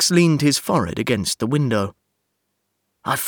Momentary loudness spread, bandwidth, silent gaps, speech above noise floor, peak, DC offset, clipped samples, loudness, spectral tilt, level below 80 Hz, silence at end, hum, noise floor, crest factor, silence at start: 9 LU; over 20 kHz; none; 55 dB; -4 dBFS; under 0.1%; under 0.1%; -20 LUFS; -4.5 dB/octave; -52 dBFS; 0 s; none; -74 dBFS; 16 dB; 0 s